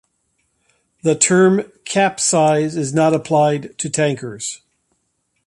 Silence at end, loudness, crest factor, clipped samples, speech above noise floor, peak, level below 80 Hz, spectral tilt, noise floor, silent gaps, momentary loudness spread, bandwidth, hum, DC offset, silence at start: 0.9 s; -17 LUFS; 18 dB; under 0.1%; 53 dB; 0 dBFS; -60 dBFS; -4.5 dB/octave; -69 dBFS; none; 12 LU; 11.5 kHz; none; under 0.1%; 1.05 s